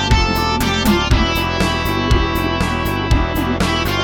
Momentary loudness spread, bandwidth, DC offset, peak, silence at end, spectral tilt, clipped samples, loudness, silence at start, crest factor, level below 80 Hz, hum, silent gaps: 3 LU; 19 kHz; under 0.1%; 0 dBFS; 0 s; -5 dB/octave; under 0.1%; -17 LUFS; 0 s; 16 dB; -22 dBFS; none; none